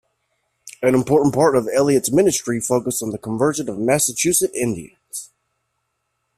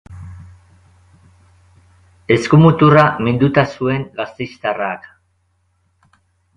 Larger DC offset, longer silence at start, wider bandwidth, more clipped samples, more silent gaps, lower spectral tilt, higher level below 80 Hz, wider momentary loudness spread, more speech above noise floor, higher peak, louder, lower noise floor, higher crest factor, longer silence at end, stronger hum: neither; first, 0.65 s vs 0.1 s; first, 15.5 kHz vs 9.4 kHz; neither; neither; second, -4.5 dB/octave vs -7.5 dB/octave; second, -54 dBFS vs -46 dBFS; second, 12 LU vs 20 LU; first, 55 dB vs 49 dB; about the same, -2 dBFS vs 0 dBFS; second, -18 LUFS vs -14 LUFS; first, -73 dBFS vs -63 dBFS; about the same, 18 dB vs 18 dB; second, 1.1 s vs 1.6 s; neither